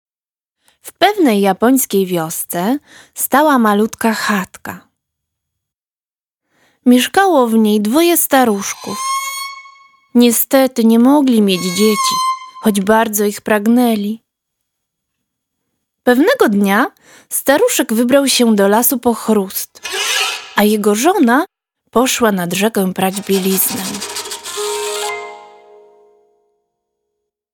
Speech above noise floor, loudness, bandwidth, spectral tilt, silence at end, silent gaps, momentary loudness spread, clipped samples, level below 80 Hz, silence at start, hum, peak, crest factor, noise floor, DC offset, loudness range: over 77 dB; -14 LUFS; 19.5 kHz; -4 dB/octave; 2.1 s; 5.75-5.79 s, 5.91-6.00 s; 11 LU; under 0.1%; -58 dBFS; 0.85 s; none; 0 dBFS; 14 dB; under -90 dBFS; under 0.1%; 6 LU